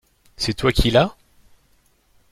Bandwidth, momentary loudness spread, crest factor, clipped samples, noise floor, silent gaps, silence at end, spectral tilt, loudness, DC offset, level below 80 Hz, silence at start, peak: 16 kHz; 9 LU; 20 dB; under 0.1%; -60 dBFS; none; 1.2 s; -5 dB/octave; -20 LUFS; under 0.1%; -32 dBFS; 0.4 s; -2 dBFS